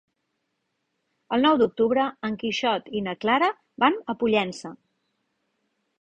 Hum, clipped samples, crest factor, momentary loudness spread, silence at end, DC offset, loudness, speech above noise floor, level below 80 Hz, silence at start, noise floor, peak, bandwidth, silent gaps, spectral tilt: none; under 0.1%; 20 dB; 9 LU; 1.25 s; under 0.1%; -24 LUFS; 54 dB; -66 dBFS; 1.3 s; -77 dBFS; -6 dBFS; 9.2 kHz; none; -5 dB/octave